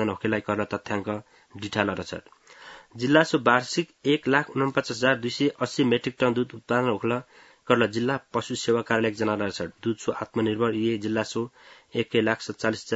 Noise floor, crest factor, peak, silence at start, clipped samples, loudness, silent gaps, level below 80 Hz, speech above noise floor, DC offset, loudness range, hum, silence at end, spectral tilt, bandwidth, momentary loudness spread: -48 dBFS; 22 dB; -2 dBFS; 0 s; under 0.1%; -26 LUFS; none; -66 dBFS; 22 dB; under 0.1%; 3 LU; none; 0 s; -5 dB/octave; 8 kHz; 11 LU